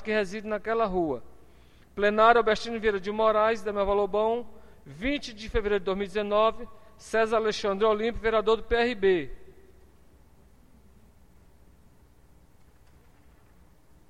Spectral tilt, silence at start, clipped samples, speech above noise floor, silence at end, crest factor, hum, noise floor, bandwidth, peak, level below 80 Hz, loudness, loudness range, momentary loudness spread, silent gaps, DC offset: -5 dB/octave; 0 s; under 0.1%; 33 dB; 4.6 s; 22 dB; none; -58 dBFS; 11 kHz; -6 dBFS; -46 dBFS; -26 LUFS; 4 LU; 9 LU; none; under 0.1%